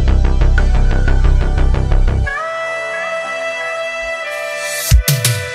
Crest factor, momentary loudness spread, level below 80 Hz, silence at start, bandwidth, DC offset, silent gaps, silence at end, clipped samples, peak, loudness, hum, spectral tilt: 14 dB; 6 LU; -14 dBFS; 0 s; 16 kHz; under 0.1%; none; 0 s; under 0.1%; 0 dBFS; -17 LUFS; none; -4.5 dB/octave